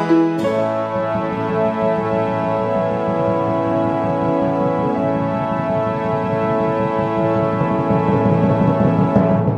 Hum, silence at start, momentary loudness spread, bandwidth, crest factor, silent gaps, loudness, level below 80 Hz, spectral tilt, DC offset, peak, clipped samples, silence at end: none; 0 s; 5 LU; 9 kHz; 16 dB; none; -18 LUFS; -46 dBFS; -9 dB/octave; under 0.1%; -2 dBFS; under 0.1%; 0 s